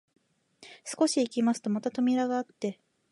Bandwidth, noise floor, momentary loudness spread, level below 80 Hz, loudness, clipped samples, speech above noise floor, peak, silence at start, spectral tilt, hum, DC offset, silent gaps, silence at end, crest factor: 11.5 kHz; -58 dBFS; 10 LU; -82 dBFS; -29 LUFS; under 0.1%; 30 dB; -12 dBFS; 0.6 s; -4.5 dB/octave; none; under 0.1%; none; 0.4 s; 18 dB